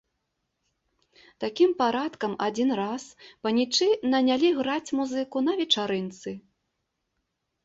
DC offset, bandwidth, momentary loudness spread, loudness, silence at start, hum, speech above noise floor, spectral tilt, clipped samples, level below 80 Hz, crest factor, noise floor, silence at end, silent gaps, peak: under 0.1%; 8 kHz; 13 LU; -26 LUFS; 1.4 s; none; 54 dB; -4 dB/octave; under 0.1%; -70 dBFS; 20 dB; -79 dBFS; 1.25 s; none; -8 dBFS